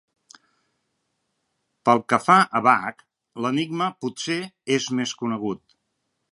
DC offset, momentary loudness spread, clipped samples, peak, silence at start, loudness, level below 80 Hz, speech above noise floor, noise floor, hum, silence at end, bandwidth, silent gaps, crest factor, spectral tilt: under 0.1%; 13 LU; under 0.1%; -2 dBFS; 1.85 s; -22 LUFS; -70 dBFS; 54 dB; -76 dBFS; none; 0.75 s; 11.5 kHz; none; 22 dB; -4.5 dB/octave